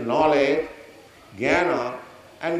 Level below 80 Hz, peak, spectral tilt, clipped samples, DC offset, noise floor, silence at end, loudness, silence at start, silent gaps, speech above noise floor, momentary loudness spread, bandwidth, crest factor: -56 dBFS; -6 dBFS; -5.5 dB/octave; under 0.1%; under 0.1%; -47 dBFS; 0 s; -22 LUFS; 0 s; none; 27 dB; 15 LU; 13.5 kHz; 18 dB